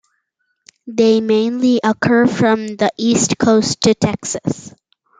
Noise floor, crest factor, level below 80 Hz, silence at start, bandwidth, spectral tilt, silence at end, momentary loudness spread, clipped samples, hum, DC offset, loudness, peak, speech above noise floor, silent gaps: -69 dBFS; 14 dB; -52 dBFS; 0.85 s; 9.6 kHz; -4.5 dB/octave; 0.5 s; 8 LU; under 0.1%; none; under 0.1%; -15 LUFS; -2 dBFS; 55 dB; none